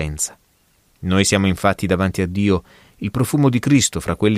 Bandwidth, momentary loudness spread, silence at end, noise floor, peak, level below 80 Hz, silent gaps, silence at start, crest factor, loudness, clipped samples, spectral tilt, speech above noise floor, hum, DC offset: 15.5 kHz; 9 LU; 0 s; -59 dBFS; -2 dBFS; -40 dBFS; none; 0 s; 16 dB; -18 LUFS; under 0.1%; -5 dB/octave; 41 dB; none; under 0.1%